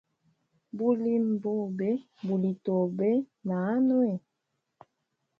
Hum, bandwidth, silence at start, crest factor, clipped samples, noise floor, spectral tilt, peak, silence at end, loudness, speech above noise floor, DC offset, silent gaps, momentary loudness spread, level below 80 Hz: none; 5 kHz; 0.75 s; 16 dB; under 0.1%; -81 dBFS; -11 dB/octave; -14 dBFS; 1.2 s; -29 LUFS; 54 dB; under 0.1%; none; 7 LU; -78 dBFS